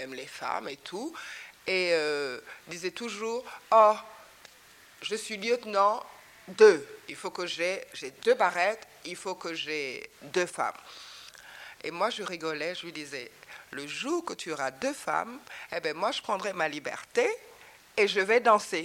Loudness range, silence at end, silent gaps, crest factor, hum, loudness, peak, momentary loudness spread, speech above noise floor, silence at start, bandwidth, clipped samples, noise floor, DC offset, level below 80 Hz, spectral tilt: 8 LU; 0 s; none; 24 dB; none; -29 LUFS; -6 dBFS; 19 LU; 26 dB; 0 s; 16.5 kHz; under 0.1%; -56 dBFS; under 0.1%; -74 dBFS; -3 dB/octave